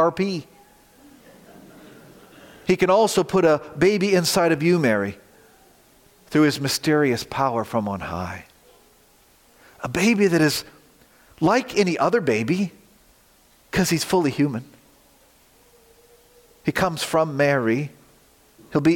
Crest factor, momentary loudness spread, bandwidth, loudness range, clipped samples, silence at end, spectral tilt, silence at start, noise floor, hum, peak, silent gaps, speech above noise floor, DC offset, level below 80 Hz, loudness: 16 dB; 11 LU; 17 kHz; 6 LU; under 0.1%; 0 s; -5 dB/octave; 0 s; -56 dBFS; none; -6 dBFS; none; 36 dB; under 0.1%; -56 dBFS; -21 LUFS